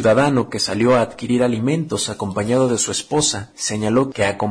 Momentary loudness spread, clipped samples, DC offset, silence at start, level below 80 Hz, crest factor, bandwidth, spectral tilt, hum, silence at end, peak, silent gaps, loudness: 6 LU; under 0.1%; under 0.1%; 0 s; -50 dBFS; 12 dB; 10.5 kHz; -4.5 dB/octave; none; 0 s; -6 dBFS; none; -19 LUFS